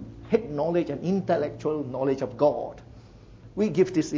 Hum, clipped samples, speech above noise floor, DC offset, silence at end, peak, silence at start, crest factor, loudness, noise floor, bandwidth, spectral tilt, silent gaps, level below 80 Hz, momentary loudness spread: none; under 0.1%; 23 dB; under 0.1%; 0 s; -8 dBFS; 0 s; 20 dB; -26 LUFS; -48 dBFS; 7.8 kHz; -7.5 dB/octave; none; -54 dBFS; 9 LU